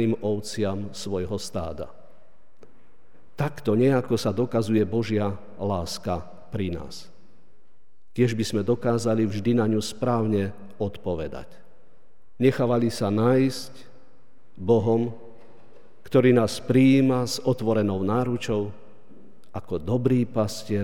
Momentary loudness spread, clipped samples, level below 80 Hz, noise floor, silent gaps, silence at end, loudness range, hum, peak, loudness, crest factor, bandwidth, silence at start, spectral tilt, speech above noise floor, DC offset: 13 LU; under 0.1%; -54 dBFS; -66 dBFS; none; 0 s; 7 LU; none; -6 dBFS; -24 LUFS; 18 dB; 16.5 kHz; 0 s; -6.5 dB/octave; 43 dB; 1%